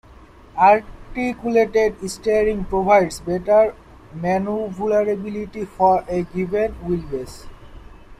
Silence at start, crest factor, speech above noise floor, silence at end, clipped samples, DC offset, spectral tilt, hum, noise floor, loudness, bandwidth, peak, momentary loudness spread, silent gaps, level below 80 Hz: 0.1 s; 18 dB; 26 dB; 0.05 s; under 0.1%; under 0.1%; -6 dB/octave; none; -45 dBFS; -20 LUFS; 14 kHz; -2 dBFS; 13 LU; none; -42 dBFS